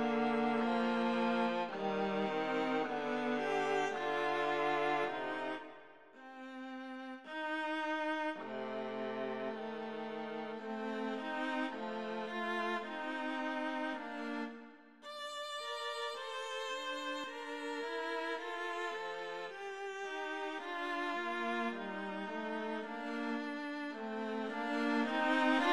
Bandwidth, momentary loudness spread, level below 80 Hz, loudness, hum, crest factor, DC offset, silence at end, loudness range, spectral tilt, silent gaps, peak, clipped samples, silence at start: 12.5 kHz; 10 LU; -80 dBFS; -38 LUFS; none; 18 dB; under 0.1%; 0 s; 6 LU; -4.5 dB/octave; none; -20 dBFS; under 0.1%; 0 s